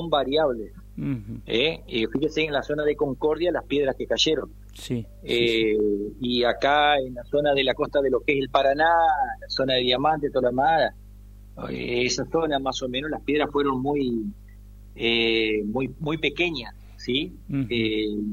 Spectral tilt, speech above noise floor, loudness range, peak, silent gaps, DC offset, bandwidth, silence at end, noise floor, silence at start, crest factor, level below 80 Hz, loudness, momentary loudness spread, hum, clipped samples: -4.5 dB/octave; 21 dB; 4 LU; -4 dBFS; none; under 0.1%; 15.5 kHz; 0 s; -44 dBFS; 0 s; 20 dB; -46 dBFS; -24 LUFS; 10 LU; 50 Hz at -45 dBFS; under 0.1%